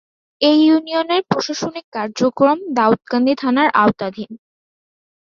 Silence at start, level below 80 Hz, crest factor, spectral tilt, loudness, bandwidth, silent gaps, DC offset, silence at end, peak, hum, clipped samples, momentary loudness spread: 0.4 s; -60 dBFS; 16 dB; -5 dB/octave; -17 LUFS; 7.4 kHz; 1.84-1.92 s; under 0.1%; 0.85 s; -2 dBFS; none; under 0.1%; 12 LU